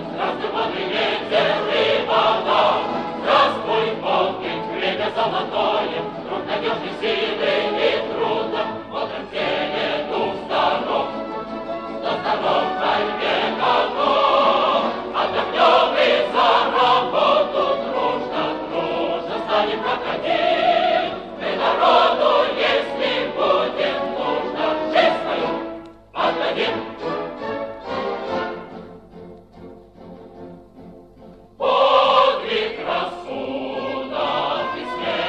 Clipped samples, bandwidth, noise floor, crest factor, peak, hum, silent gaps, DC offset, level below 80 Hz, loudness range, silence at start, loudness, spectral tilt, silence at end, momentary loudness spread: under 0.1%; 8.8 kHz; -44 dBFS; 18 dB; -2 dBFS; none; none; under 0.1%; -56 dBFS; 8 LU; 0 s; -20 LUFS; -5 dB/octave; 0 s; 11 LU